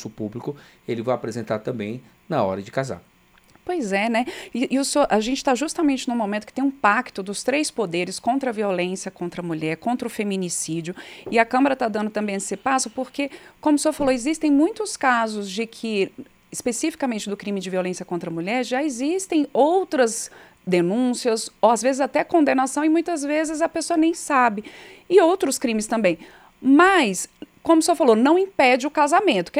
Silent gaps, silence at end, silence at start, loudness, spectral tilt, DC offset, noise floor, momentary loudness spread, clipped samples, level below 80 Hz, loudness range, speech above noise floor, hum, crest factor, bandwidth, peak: none; 0 s; 0 s; -22 LUFS; -4 dB/octave; under 0.1%; -55 dBFS; 12 LU; under 0.1%; -58 dBFS; 7 LU; 34 dB; none; 18 dB; 15.5 kHz; -2 dBFS